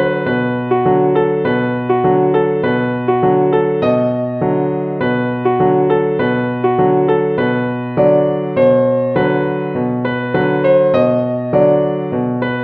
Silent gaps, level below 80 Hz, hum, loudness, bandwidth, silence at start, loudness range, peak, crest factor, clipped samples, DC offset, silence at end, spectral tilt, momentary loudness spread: none; -50 dBFS; none; -15 LUFS; 4.7 kHz; 0 s; 1 LU; -2 dBFS; 12 dB; under 0.1%; under 0.1%; 0 s; -10.5 dB/octave; 5 LU